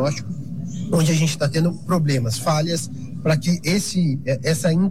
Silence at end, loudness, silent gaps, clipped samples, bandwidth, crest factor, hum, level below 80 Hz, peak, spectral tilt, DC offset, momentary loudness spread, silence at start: 0 s; -21 LUFS; none; under 0.1%; 15 kHz; 12 dB; none; -50 dBFS; -8 dBFS; -5.5 dB/octave; 1%; 10 LU; 0 s